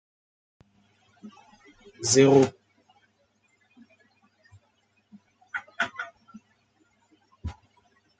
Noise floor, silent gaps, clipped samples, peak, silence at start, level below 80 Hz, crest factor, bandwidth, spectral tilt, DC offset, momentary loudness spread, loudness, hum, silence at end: -69 dBFS; none; under 0.1%; -6 dBFS; 1.25 s; -58 dBFS; 26 dB; 9.4 kHz; -4.5 dB/octave; under 0.1%; 29 LU; -23 LUFS; none; 0.65 s